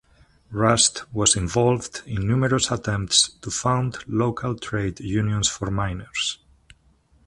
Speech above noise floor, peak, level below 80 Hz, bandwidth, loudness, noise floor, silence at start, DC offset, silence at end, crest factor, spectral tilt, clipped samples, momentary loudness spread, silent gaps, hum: 37 dB; -2 dBFS; -44 dBFS; 11.5 kHz; -22 LUFS; -59 dBFS; 0.5 s; under 0.1%; 0.9 s; 22 dB; -3.5 dB/octave; under 0.1%; 9 LU; none; none